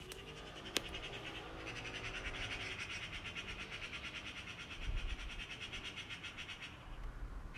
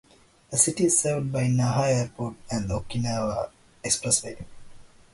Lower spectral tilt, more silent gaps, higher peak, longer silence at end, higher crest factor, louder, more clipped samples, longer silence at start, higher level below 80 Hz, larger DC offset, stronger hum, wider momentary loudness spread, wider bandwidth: second, -3 dB/octave vs -4.5 dB/octave; neither; second, -14 dBFS vs -6 dBFS; second, 0 s vs 0.25 s; first, 32 dB vs 20 dB; second, -45 LUFS vs -25 LUFS; neither; second, 0 s vs 0.5 s; about the same, -52 dBFS vs -50 dBFS; neither; neither; second, 8 LU vs 14 LU; first, 15 kHz vs 12 kHz